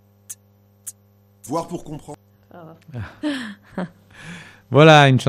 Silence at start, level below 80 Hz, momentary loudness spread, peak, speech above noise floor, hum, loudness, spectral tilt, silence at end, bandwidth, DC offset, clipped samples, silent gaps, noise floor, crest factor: 0.3 s; -56 dBFS; 28 LU; 0 dBFS; 37 dB; none; -16 LUFS; -5.5 dB/octave; 0 s; 15.5 kHz; under 0.1%; under 0.1%; none; -55 dBFS; 20 dB